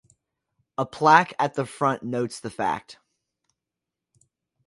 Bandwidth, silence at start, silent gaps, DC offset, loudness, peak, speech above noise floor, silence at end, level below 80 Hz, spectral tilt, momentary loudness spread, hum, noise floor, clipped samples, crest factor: 11.5 kHz; 0.8 s; none; under 0.1%; -23 LUFS; -2 dBFS; 64 dB; 1.75 s; -66 dBFS; -5 dB/octave; 14 LU; none; -87 dBFS; under 0.1%; 26 dB